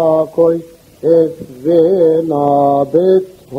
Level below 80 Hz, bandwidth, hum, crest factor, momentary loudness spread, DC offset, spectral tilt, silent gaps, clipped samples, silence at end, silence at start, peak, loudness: -54 dBFS; 7.2 kHz; none; 12 dB; 7 LU; under 0.1%; -9 dB/octave; none; under 0.1%; 0 s; 0 s; 0 dBFS; -13 LUFS